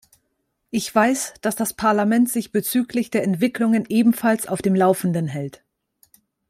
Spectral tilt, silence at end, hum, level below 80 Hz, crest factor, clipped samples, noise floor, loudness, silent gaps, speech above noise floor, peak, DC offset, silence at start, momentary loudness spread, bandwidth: -5.5 dB/octave; 1 s; none; -60 dBFS; 16 dB; under 0.1%; -73 dBFS; -20 LUFS; none; 53 dB; -4 dBFS; under 0.1%; 0.75 s; 7 LU; 16 kHz